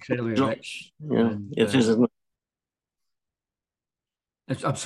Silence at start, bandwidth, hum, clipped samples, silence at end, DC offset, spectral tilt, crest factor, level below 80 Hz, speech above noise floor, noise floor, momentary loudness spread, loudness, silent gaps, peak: 0 s; 12 kHz; none; under 0.1%; 0 s; under 0.1%; -6 dB/octave; 18 dB; -70 dBFS; over 66 dB; under -90 dBFS; 13 LU; -25 LUFS; none; -8 dBFS